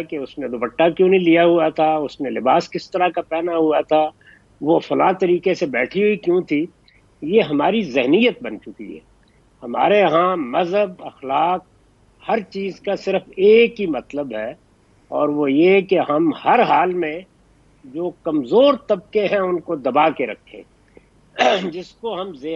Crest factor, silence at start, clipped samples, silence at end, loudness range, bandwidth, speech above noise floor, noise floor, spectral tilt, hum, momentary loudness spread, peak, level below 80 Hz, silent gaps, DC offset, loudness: 16 dB; 0 s; under 0.1%; 0 s; 3 LU; 7.6 kHz; 36 dB; -54 dBFS; -6.5 dB/octave; none; 14 LU; -2 dBFS; -58 dBFS; none; under 0.1%; -18 LUFS